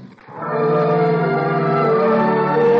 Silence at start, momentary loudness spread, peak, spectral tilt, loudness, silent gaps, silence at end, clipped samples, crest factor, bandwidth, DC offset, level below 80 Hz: 0 s; 8 LU; -8 dBFS; -9.5 dB/octave; -17 LUFS; none; 0 s; under 0.1%; 8 dB; 5.6 kHz; under 0.1%; -60 dBFS